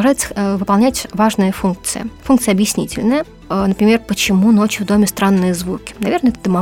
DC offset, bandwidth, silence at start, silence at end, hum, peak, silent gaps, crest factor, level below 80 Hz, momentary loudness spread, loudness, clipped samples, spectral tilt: under 0.1%; 17 kHz; 0 s; 0 s; none; -2 dBFS; none; 14 dB; -40 dBFS; 8 LU; -15 LUFS; under 0.1%; -5 dB/octave